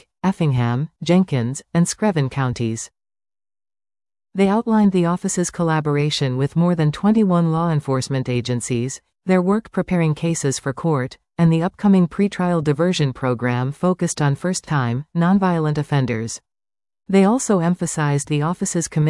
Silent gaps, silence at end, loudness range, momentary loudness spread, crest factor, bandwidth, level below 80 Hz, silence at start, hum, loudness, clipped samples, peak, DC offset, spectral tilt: none; 0 s; 3 LU; 7 LU; 14 dB; 12 kHz; -52 dBFS; 0.25 s; none; -19 LUFS; under 0.1%; -6 dBFS; under 0.1%; -6 dB/octave